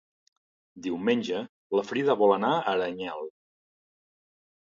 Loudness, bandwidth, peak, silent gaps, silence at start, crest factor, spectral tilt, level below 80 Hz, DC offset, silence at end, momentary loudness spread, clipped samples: -27 LUFS; 7.6 kHz; -10 dBFS; 1.49-1.70 s; 0.75 s; 20 dB; -6 dB/octave; -72 dBFS; under 0.1%; 1.4 s; 14 LU; under 0.1%